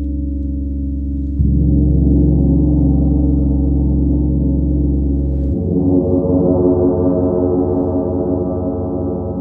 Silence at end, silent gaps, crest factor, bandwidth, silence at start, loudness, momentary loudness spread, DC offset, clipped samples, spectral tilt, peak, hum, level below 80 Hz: 0 s; none; 12 dB; 1.6 kHz; 0 s; -16 LUFS; 8 LU; under 0.1%; under 0.1%; -15 dB/octave; -2 dBFS; none; -20 dBFS